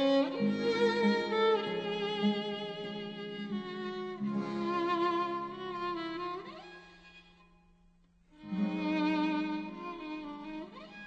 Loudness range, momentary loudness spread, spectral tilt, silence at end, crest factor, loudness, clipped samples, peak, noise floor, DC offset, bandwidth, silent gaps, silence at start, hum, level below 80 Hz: 8 LU; 14 LU; -6.5 dB/octave; 0 s; 16 dB; -34 LUFS; under 0.1%; -18 dBFS; -65 dBFS; under 0.1%; 8.4 kHz; none; 0 s; none; -68 dBFS